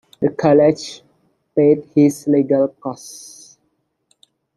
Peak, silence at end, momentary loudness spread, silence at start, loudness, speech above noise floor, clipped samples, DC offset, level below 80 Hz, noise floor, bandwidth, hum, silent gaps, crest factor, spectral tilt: -2 dBFS; 1.4 s; 20 LU; 0.2 s; -16 LUFS; 52 dB; under 0.1%; under 0.1%; -62 dBFS; -68 dBFS; 12.5 kHz; none; none; 16 dB; -7 dB/octave